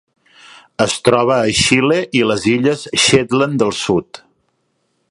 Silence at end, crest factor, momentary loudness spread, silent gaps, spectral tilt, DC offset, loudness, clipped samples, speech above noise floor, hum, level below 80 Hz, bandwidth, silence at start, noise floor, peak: 0.95 s; 16 dB; 6 LU; none; -4 dB/octave; under 0.1%; -14 LUFS; under 0.1%; 51 dB; none; -46 dBFS; 11.5 kHz; 0.8 s; -66 dBFS; 0 dBFS